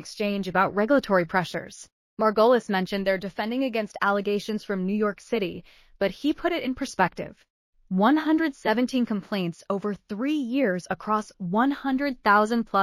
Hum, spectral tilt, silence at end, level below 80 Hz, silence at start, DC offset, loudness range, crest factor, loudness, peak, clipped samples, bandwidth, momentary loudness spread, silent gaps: none; -6 dB/octave; 0 s; -58 dBFS; 0 s; under 0.1%; 3 LU; 18 dB; -25 LUFS; -6 dBFS; under 0.1%; 15.5 kHz; 9 LU; 1.92-2.17 s, 7.50-7.73 s